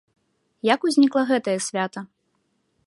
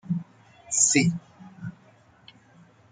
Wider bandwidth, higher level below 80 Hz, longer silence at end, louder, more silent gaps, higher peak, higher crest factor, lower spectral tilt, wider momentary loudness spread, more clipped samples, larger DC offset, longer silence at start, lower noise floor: first, 11.5 kHz vs 9.6 kHz; second, -76 dBFS vs -66 dBFS; second, 0.8 s vs 1.2 s; about the same, -22 LUFS vs -22 LUFS; neither; first, -2 dBFS vs -6 dBFS; about the same, 22 dB vs 22 dB; about the same, -4 dB/octave vs -3 dB/octave; second, 10 LU vs 22 LU; neither; neither; first, 0.65 s vs 0.05 s; first, -71 dBFS vs -57 dBFS